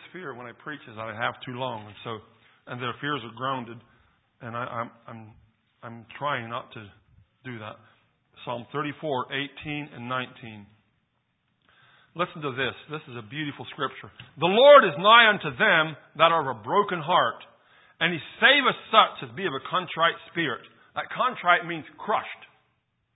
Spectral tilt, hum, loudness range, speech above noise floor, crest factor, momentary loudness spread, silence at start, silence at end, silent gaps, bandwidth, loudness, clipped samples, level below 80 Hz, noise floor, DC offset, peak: -8.5 dB/octave; none; 17 LU; 48 dB; 26 dB; 23 LU; 0.05 s; 0.7 s; none; 4 kHz; -24 LUFS; under 0.1%; -68 dBFS; -74 dBFS; under 0.1%; 0 dBFS